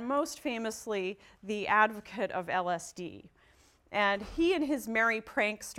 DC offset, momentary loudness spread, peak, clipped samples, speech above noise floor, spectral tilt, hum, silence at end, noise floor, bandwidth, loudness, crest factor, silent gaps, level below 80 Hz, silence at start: under 0.1%; 12 LU; -12 dBFS; under 0.1%; 32 dB; -3.5 dB/octave; none; 0 s; -64 dBFS; 16.5 kHz; -31 LUFS; 20 dB; none; -60 dBFS; 0 s